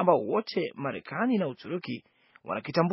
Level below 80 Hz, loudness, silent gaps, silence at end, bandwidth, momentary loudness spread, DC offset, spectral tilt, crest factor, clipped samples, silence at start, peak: -76 dBFS; -30 LUFS; none; 0 s; 5.8 kHz; 11 LU; under 0.1%; -5.5 dB/octave; 22 dB; under 0.1%; 0 s; -8 dBFS